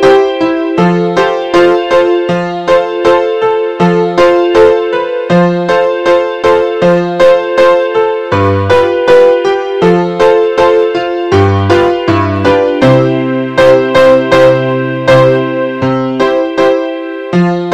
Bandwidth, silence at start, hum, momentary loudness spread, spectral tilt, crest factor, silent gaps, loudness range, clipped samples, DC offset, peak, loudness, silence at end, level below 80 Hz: 9.6 kHz; 0 s; none; 6 LU; -7 dB/octave; 8 dB; none; 2 LU; 0.9%; 0.5%; 0 dBFS; -9 LUFS; 0 s; -42 dBFS